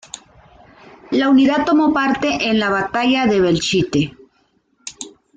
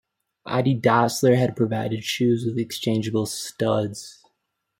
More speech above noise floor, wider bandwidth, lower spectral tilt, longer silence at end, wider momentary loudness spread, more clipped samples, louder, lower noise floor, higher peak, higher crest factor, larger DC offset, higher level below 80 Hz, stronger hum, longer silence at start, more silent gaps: second, 46 dB vs 55 dB; second, 9.4 kHz vs 16.5 kHz; about the same, -5 dB/octave vs -5.5 dB/octave; second, 0.3 s vs 0.65 s; first, 21 LU vs 10 LU; neither; first, -16 LUFS vs -23 LUFS; second, -61 dBFS vs -77 dBFS; about the same, -6 dBFS vs -4 dBFS; second, 12 dB vs 20 dB; neither; first, -50 dBFS vs -62 dBFS; neither; first, 1.1 s vs 0.45 s; neither